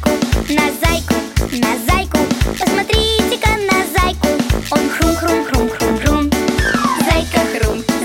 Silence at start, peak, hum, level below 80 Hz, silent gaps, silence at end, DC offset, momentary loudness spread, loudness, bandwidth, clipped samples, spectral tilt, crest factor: 0 s; 0 dBFS; none; -24 dBFS; none; 0 s; under 0.1%; 3 LU; -15 LUFS; 17 kHz; under 0.1%; -4.5 dB/octave; 14 dB